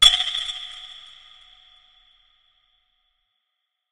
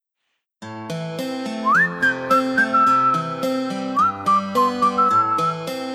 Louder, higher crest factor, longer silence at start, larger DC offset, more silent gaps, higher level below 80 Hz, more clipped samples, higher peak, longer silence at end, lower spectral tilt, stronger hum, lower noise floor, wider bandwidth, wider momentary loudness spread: about the same, -21 LUFS vs -19 LUFS; first, 26 dB vs 14 dB; second, 0 s vs 0.6 s; neither; neither; first, -48 dBFS vs -64 dBFS; neither; first, 0 dBFS vs -6 dBFS; first, 2.95 s vs 0 s; second, 2.5 dB/octave vs -5 dB/octave; neither; about the same, -79 dBFS vs -76 dBFS; second, 12 kHz vs 15 kHz; first, 27 LU vs 11 LU